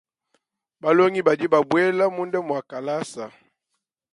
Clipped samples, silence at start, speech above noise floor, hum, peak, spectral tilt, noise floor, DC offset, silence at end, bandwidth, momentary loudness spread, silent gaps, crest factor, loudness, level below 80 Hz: under 0.1%; 0.85 s; 58 dB; none; -4 dBFS; -6 dB/octave; -79 dBFS; under 0.1%; 0.85 s; 11.5 kHz; 12 LU; none; 20 dB; -21 LUFS; -72 dBFS